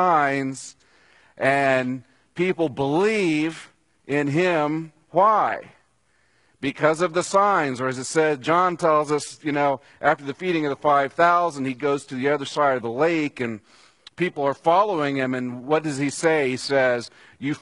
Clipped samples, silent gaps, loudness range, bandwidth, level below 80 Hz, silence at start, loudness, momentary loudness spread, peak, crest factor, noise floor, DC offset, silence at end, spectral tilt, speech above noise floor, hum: under 0.1%; none; 2 LU; 11 kHz; -68 dBFS; 0 s; -22 LUFS; 11 LU; -2 dBFS; 20 dB; -65 dBFS; under 0.1%; 0.05 s; -5 dB/octave; 43 dB; none